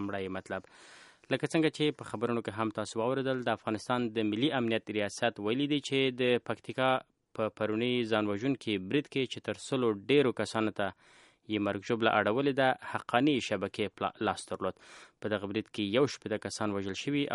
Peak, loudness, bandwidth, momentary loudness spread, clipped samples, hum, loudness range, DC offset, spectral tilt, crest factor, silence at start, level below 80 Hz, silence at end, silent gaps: -10 dBFS; -32 LUFS; 11.5 kHz; 9 LU; under 0.1%; none; 3 LU; under 0.1%; -5 dB/octave; 22 dB; 0 s; -72 dBFS; 0 s; none